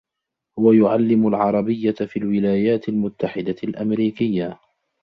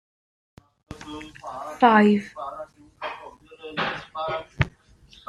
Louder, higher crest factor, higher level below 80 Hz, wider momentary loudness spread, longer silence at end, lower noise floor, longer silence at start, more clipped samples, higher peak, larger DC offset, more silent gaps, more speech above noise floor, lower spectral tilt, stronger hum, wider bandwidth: first, -20 LUFS vs -23 LUFS; second, 16 dB vs 24 dB; second, -58 dBFS vs -50 dBFS; second, 10 LU vs 24 LU; about the same, 0.5 s vs 0.6 s; first, -82 dBFS vs -53 dBFS; second, 0.55 s vs 0.9 s; neither; about the same, -4 dBFS vs -2 dBFS; neither; neither; first, 64 dB vs 30 dB; first, -10 dB/octave vs -6.5 dB/octave; neither; second, 5.2 kHz vs 9.6 kHz